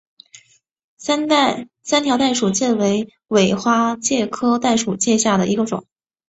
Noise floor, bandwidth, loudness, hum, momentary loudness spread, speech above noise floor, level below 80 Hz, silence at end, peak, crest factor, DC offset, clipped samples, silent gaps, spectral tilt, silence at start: -54 dBFS; 8.2 kHz; -18 LUFS; none; 6 LU; 36 dB; -58 dBFS; 0.5 s; -2 dBFS; 16 dB; under 0.1%; under 0.1%; none; -4 dB/octave; 1 s